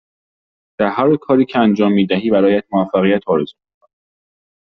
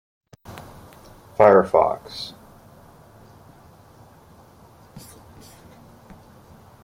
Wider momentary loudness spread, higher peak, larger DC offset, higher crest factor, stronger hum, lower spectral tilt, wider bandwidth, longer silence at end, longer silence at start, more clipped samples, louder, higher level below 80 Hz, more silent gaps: second, 6 LU vs 30 LU; about the same, -2 dBFS vs -2 dBFS; neither; second, 14 dB vs 24 dB; neither; about the same, -5.5 dB/octave vs -6 dB/octave; second, 6 kHz vs 16.5 kHz; second, 1.15 s vs 1.85 s; first, 0.8 s vs 0.5 s; neither; first, -15 LUFS vs -18 LUFS; about the same, -56 dBFS vs -56 dBFS; neither